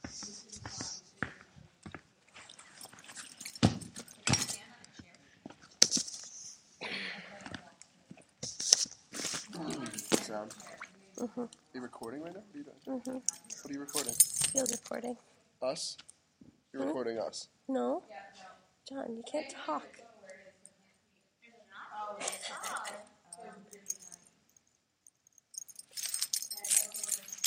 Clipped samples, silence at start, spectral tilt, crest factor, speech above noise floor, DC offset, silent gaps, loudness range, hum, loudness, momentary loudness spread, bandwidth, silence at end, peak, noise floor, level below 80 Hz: under 0.1%; 0.05 s; -2 dB/octave; 38 dB; 37 dB; under 0.1%; none; 12 LU; none; -34 LUFS; 24 LU; 16 kHz; 0 s; 0 dBFS; -74 dBFS; -68 dBFS